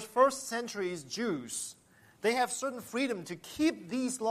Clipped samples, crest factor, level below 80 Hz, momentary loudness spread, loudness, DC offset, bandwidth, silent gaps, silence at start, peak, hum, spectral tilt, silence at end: under 0.1%; 20 dB; -70 dBFS; 10 LU; -33 LUFS; under 0.1%; 15 kHz; none; 0 s; -12 dBFS; none; -3 dB/octave; 0 s